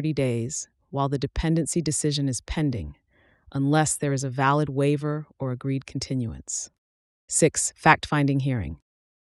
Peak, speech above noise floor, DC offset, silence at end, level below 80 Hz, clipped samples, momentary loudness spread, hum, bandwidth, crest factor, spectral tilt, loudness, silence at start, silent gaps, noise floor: -4 dBFS; 33 dB; under 0.1%; 0.45 s; -44 dBFS; under 0.1%; 11 LU; none; 13 kHz; 22 dB; -5 dB/octave; -25 LUFS; 0 s; 6.78-7.28 s; -58 dBFS